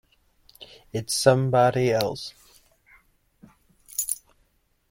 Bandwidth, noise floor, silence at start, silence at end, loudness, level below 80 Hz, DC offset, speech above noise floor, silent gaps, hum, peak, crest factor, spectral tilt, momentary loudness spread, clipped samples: 16.5 kHz; -67 dBFS; 0.6 s; 0.75 s; -24 LUFS; -58 dBFS; under 0.1%; 45 dB; none; none; -4 dBFS; 22 dB; -4.5 dB/octave; 18 LU; under 0.1%